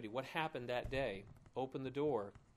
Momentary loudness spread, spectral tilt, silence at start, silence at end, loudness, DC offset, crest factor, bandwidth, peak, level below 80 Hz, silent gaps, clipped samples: 6 LU; -6.5 dB/octave; 0 s; 0.15 s; -42 LUFS; under 0.1%; 20 dB; 15.5 kHz; -22 dBFS; -60 dBFS; none; under 0.1%